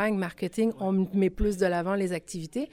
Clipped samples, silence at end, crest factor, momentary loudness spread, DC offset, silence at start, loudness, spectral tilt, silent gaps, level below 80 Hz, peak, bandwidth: under 0.1%; 0.05 s; 14 dB; 7 LU; under 0.1%; 0 s; -28 LUFS; -6.5 dB/octave; none; -42 dBFS; -14 dBFS; 15 kHz